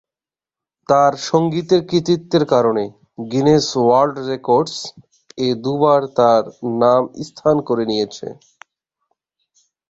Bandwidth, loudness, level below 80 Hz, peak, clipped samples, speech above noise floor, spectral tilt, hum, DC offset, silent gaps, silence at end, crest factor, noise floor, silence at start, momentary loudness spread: 8 kHz; -17 LUFS; -56 dBFS; -2 dBFS; under 0.1%; over 74 dB; -6 dB/octave; none; under 0.1%; none; 1.55 s; 16 dB; under -90 dBFS; 0.9 s; 11 LU